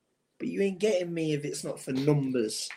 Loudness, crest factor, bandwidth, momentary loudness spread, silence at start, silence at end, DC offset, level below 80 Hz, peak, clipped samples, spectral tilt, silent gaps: -30 LUFS; 18 dB; 16 kHz; 9 LU; 0.4 s; 0 s; under 0.1%; -74 dBFS; -12 dBFS; under 0.1%; -5.5 dB/octave; none